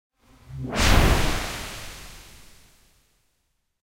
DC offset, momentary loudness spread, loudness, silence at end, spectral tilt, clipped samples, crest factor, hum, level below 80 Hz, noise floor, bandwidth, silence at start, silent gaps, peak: under 0.1%; 24 LU; -23 LUFS; 1.05 s; -4 dB/octave; under 0.1%; 22 dB; none; -30 dBFS; -73 dBFS; 16 kHz; 0.3 s; none; -4 dBFS